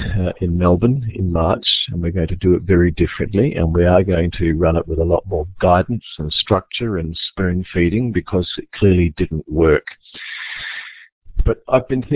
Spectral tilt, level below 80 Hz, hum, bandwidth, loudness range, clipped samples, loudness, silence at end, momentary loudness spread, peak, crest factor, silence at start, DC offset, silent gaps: -11 dB/octave; -28 dBFS; none; 4 kHz; 3 LU; under 0.1%; -18 LUFS; 0 s; 11 LU; -2 dBFS; 16 dB; 0 s; under 0.1%; 11.12-11.22 s